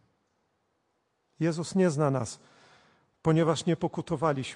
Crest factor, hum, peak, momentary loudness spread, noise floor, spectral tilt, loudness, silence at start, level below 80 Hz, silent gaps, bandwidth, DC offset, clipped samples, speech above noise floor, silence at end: 18 dB; none; -12 dBFS; 7 LU; -76 dBFS; -6.5 dB/octave; -28 LUFS; 1.4 s; -64 dBFS; none; 11 kHz; under 0.1%; under 0.1%; 49 dB; 0 s